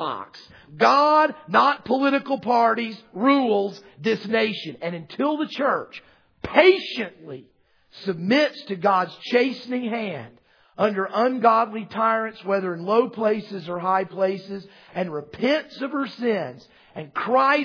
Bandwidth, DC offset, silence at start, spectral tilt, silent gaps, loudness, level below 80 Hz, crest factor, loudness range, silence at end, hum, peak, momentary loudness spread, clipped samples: 5.4 kHz; under 0.1%; 0 s; -6 dB/octave; none; -22 LUFS; -64 dBFS; 22 dB; 5 LU; 0 s; none; -2 dBFS; 14 LU; under 0.1%